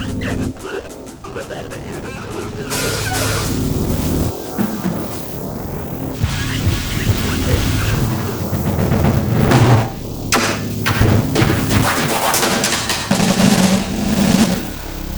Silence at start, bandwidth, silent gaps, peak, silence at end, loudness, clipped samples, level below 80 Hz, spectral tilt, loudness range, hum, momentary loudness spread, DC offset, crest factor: 0 s; over 20 kHz; none; 0 dBFS; 0 s; -17 LUFS; under 0.1%; -30 dBFS; -5 dB/octave; 6 LU; none; 14 LU; under 0.1%; 16 dB